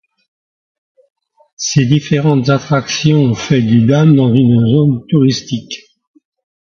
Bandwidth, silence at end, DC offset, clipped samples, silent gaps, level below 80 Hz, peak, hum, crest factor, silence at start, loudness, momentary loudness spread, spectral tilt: 7.2 kHz; 0.9 s; under 0.1%; under 0.1%; none; -48 dBFS; 0 dBFS; none; 12 dB; 1.6 s; -12 LUFS; 11 LU; -6.5 dB/octave